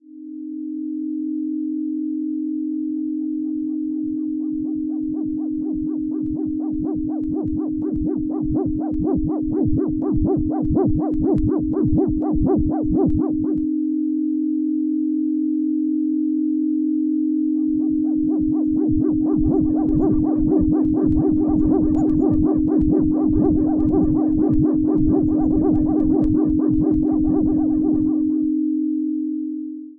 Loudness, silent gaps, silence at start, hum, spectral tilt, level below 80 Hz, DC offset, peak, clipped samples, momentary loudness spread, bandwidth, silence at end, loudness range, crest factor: -20 LUFS; none; 0.1 s; none; -13.5 dB/octave; -34 dBFS; under 0.1%; -8 dBFS; under 0.1%; 7 LU; 1.7 kHz; 0.05 s; 6 LU; 12 dB